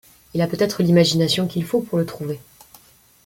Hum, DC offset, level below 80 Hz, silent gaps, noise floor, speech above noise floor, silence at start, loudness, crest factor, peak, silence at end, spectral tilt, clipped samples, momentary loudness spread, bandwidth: none; under 0.1%; -56 dBFS; none; -52 dBFS; 33 dB; 0.35 s; -20 LUFS; 18 dB; -4 dBFS; 0.85 s; -5.5 dB/octave; under 0.1%; 14 LU; 17 kHz